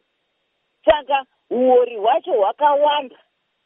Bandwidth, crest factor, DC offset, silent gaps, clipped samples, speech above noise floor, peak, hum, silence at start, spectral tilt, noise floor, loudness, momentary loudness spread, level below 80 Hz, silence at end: 3.8 kHz; 16 dB; under 0.1%; none; under 0.1%; 53 dB; -2 dBFS; none; 0.85 s; -0.5 dB/octave; -71 dBFS; -18 LUFS; 8 LU; -54 dBFS; 0.6 s